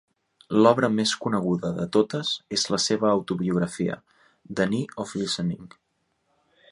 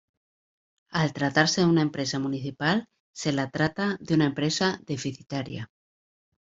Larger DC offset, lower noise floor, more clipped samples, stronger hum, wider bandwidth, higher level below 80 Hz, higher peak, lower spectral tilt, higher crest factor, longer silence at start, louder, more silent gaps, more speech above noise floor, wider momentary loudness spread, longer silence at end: neither; second, -73 dBFS vs under -90 dBFS; neither; neither; first, 11.5 kHz vs 7.8 kHz; about the same, -60 dBFS vs -62 dBFS; about the same, -4 dBFS vs -4 dBFS; about the same, -4.5 dB/octave vs -5 dB/octave; about the same, 22 dB vs 22 dB; second, 0.5 s vs 0.9 s; about the same, -24 LUFS vs -26 LUFS; second, none vs 3.00-3.14 s; second, 49 dB vs over 64 dB; about the same, 10 LU vs 11 LU; first, 1.05 s vs 0.85 s